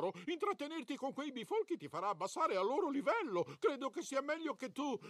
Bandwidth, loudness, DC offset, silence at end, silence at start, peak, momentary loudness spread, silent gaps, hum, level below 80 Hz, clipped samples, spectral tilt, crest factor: 14 kHz; -39 LUFS; under 0.1%; 0 s; 0 s; -22 dBFS; 7 LU; none; none; -88 dBFS; under 0.1%; -4.5 dB/octave; 16 dB